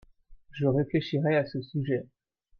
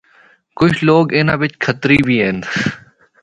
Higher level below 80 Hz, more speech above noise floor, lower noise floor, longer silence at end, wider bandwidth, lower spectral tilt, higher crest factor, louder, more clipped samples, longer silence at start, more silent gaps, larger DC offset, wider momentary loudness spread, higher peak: second, -60 dBFS vs -44 dBFS; second, 26 dB vs 36 dB; about the same, -53 dBFS vs -50 dBFS; about the same, 0.55 s vs 0.45 s; second, 6.4 kHz vs 10.5 kHz; first, -9 dB/octave vs -6.5 dB/octave; about the same, 18 dB vs 16 dB; second, -29 LUFS vs -14 LUFS; neither; second, 0.3 s vs 0.55 s; neither; neither; about the same, 7 LU vs 7 LU; second, -12 dBFS vs 0 dBFS